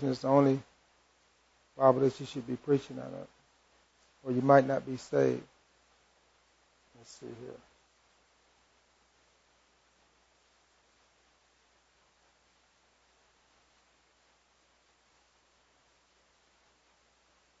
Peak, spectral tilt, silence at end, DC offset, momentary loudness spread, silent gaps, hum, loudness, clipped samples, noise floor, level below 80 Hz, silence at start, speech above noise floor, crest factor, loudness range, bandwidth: -8 dBFS; -7.5 dB/octave; 10.05 s; under 0.1%; 25 LU; none; 60 Hz at -75 dBFS; -29 LUFS; under 0.1%; -69 dBFS; -74 dBFS; 0 s; 40 dB; 28 dB; 24 LU; 8 kHz